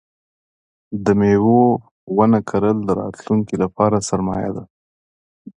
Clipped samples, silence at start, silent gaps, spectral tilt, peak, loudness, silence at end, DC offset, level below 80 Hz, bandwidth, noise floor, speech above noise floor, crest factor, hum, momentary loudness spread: under 0.1%; 0.9 s; 1.91-2.07 s, 4.70-5.45 s; -7.5 dB/octave; 0 dBFS; -18 LUFS; 0.05 s; under 0.1%; -48 dBFS; 10 kHz; under -90 dBFS; over 73 dB; 18 dB; none; 11 LU